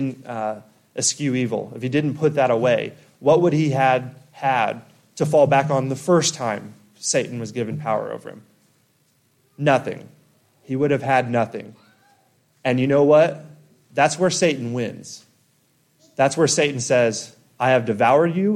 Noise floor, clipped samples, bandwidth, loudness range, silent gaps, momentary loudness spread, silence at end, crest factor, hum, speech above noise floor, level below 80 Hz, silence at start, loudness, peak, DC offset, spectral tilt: -63 dBFS; under 0.1%; 14 kHz; 6 LU; none; 16 LU; 0 s; 16 dB; none; 43 dB; -66 dBFS; 0 s; -20 LUFS; -4 dBFS; under 0.1%; -4.5 dB/octave